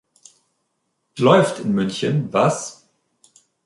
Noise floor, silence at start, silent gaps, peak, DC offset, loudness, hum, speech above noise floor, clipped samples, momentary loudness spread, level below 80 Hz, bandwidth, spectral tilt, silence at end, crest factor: -72 dBFS; 1.15 s; none; -2 dBFS; under 0.1%; -19 LUFS; none; 55 dB; under 0.1%; 15 LU; -62 dBFS; 11.5 kHz; -5.5 dB/octave; 0.95 s; 20 dB